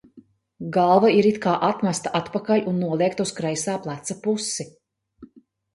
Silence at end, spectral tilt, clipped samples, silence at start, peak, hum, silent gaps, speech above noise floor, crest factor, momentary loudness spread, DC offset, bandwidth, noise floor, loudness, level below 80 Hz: 0.5 s; -5 dB/octave; under 0.1%; 0.15 s; -4 dBFS; none; none; 31 dB; 20 dB; 12 LU; under 0.1%; 11.5 kHz; -53 dBFS; -22 LUFS; -64 dBFS